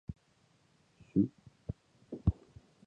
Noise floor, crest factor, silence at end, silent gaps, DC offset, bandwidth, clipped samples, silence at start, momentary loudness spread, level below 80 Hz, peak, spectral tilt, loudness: -70 dBFS; 24 dB; 0.55 s; none; under 0.1%; 7.4 kHz; under 0.1%; 0.1 s; 18 LU; -48 dBFS; -16 dBFS; -11 dB/octave; -36 LUFS